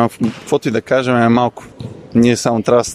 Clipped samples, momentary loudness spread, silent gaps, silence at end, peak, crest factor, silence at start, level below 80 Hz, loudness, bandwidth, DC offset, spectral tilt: under 0.1%; 14 LU; none; 0 s; 0 dBFS; 14 dB; 0 s; -48 dBFS; -15 LUFS; 13.5 kHz; under 0.1%; -5.5 dB/octave